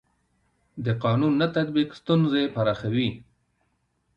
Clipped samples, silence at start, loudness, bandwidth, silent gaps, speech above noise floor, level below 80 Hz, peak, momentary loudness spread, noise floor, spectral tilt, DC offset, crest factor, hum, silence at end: under 0.1%; 0.75 s; -24 LUFS; 7 kHz; none; 48 dB; -58 dBFS; -10 dBFS; 9 LU; -72 dBFS; -8.5 dB/octave; under 0.1%; 16 dB; none; 0.95 s